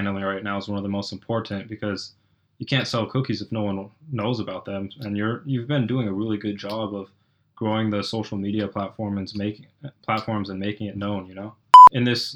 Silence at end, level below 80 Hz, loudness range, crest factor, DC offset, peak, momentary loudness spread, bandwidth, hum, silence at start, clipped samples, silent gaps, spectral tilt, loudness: 0 s; -62 dBFS; 10 LU; 22 dB; under 0.1%; 0 dBFS; 9 LU; 10 kHz; none; 0 s; under 0.1%; none; -6 dB/octave; -21 LUFS